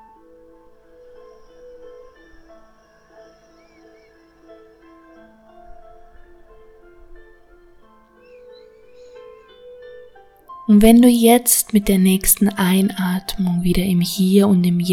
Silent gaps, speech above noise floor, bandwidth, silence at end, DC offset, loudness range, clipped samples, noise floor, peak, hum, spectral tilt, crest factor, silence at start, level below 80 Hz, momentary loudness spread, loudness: none; 37 dB; 17.5 kHz; 0 s; under 0.1%; 4 LU; under 0.1%; -52 dBFS; 0 dBFS; none; -5 dB/octave; 20 dB; 1.85 s; -40 dBFS; 10 LU; -15 LUFS